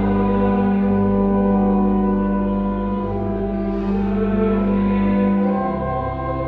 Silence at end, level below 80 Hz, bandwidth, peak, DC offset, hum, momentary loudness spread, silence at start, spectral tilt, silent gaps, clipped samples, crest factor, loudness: 0 s; -32 dBFS; 4.2 kHz; -6 dBFS; under 0.1%; 50 Hz at -40 dBFS; 6 LU; 0 s; -11 dB/octave; none; under 0.1%; 12 dB; -19 LUFS